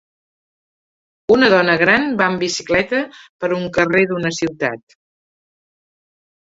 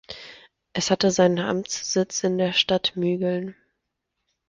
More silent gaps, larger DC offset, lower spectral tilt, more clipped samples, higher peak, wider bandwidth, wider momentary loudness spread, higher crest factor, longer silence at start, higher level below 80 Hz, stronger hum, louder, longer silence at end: first, 3.29-3.39 s vs none; neither; about the same, -4.5 dB/octave vs -4 dB/octave; neither; first, 0 dBFS vs -6 dBFS; second, 8 kHz vs 9.8 kHz; second, 11 LU vs 16 LU; about the same, 18 dB vs 20 dB; first, 1.3 s vs 0.1 s; first, -52 dBFS vs -60 dBFS; neither; first, -16 LUFS vs -23 LUFS; first, 1.75 s vs 1 s